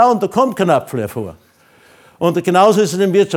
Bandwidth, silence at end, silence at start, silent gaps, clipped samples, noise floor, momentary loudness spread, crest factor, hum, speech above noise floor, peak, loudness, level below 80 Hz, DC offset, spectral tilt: 18 kHz; 0 s; 0 s; none; under 0.1%; -49 dBFS; 12 LU; 14 dB; none; 35 dB; 0 dBFS; -15 LUFS; -58 dBFS; under 0.1%; -5.5 dB/octave